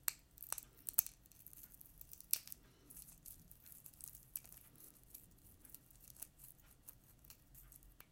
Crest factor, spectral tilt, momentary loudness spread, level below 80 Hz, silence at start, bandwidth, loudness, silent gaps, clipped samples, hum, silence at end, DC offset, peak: 42 dB; -0.5 dB/octave; 20 LU; -70 dBFS; 0 s; 17 kHz; -45 LUFS; none; under 0.1%; none; 0 s; under 0.1%; -10 dBFS